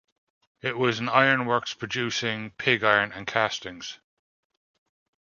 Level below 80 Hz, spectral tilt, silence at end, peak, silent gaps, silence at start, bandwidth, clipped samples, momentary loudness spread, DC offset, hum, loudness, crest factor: -66 dBFS; -4 dB/octave; 1.25 s; -2 dBFS; none; 0.65 s; 7.4 kHz; under 0.1%; 13 LU; under 0.1%; none; -24 LUFS; 24 dB